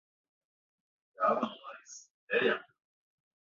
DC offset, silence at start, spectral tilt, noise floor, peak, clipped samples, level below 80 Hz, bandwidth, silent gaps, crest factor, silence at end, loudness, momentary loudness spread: under 0.1%; 1.2 s; -1.5 dB/octave; -50 dBFS; -16 dBFS; under 0.1%; -82 dBFS; 7.4 kHz; 2.10-2.27 s; 22 dB; 0.8 s; -32 LUFS; 20 LU